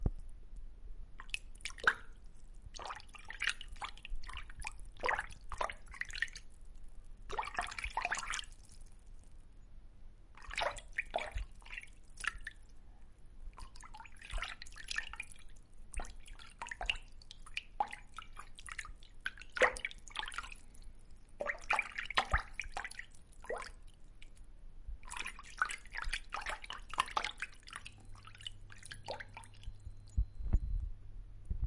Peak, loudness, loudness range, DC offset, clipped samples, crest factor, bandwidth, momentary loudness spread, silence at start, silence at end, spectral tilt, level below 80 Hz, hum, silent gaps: -12 dBFS; -41 LUFS; 7 LU; under 0.1%; under 0.1%; 30 dB; 11.5 kHz; 24 LU; 0 s; 0 s; -2.5 dB/octave; -48 dBFS; none; none